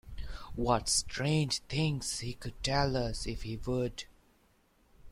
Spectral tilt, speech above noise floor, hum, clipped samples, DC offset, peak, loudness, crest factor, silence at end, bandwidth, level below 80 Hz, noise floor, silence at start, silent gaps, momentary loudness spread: -4 dB/octave; 36 dB; none; under 0.1%; under 0.1%; -14 dBFS; -33 LUFS; 20 dB; 0 s; 15 kHz; -46 dBFS; -68 dBFS; 0.05 s; none; 14 LU